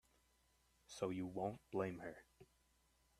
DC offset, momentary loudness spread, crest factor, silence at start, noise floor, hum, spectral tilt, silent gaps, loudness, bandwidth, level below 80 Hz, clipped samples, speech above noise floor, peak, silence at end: under 0.1%; 12 LU; 22 dB; 0.9 s; -78 dBFS; none; -6 dB/octave; none; -46 LUFS; 14 kHz; -76 dBFS; under 0.1%; 32 dB; -28 dBFS; 0.75 s